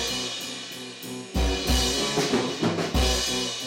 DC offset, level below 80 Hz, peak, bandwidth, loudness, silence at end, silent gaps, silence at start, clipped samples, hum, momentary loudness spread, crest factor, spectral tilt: under 0.1%; -32 dBFS; -14 dBFS; 16.5 kHz; -25 LUFS; 0 s; none; 0 s; under 0.1%; none; 12 LU; 12 dB; -3.5 dB/octave